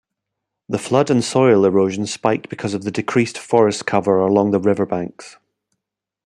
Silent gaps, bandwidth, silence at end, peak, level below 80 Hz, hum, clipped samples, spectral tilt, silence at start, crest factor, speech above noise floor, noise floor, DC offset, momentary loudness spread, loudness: none; 11.5 kHz; 0.95 s; -2 dBFS; -62 dBFS; none; under 0.1%; -6 dB/octave; 0.7 s; 16 dB; 66 dB; -83 dBFS; under 0.1%; 10 LU; -18 LUFS